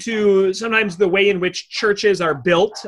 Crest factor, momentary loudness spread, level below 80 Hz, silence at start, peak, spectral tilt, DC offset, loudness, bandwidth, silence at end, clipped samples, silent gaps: 14 dB; 5 LU; -56 dBFS; 0 s; -2 dBFS; -4.5 dB/octave; under 0.1%; -17 LUFS; 11 kHz; 0 s; under 0.1%; none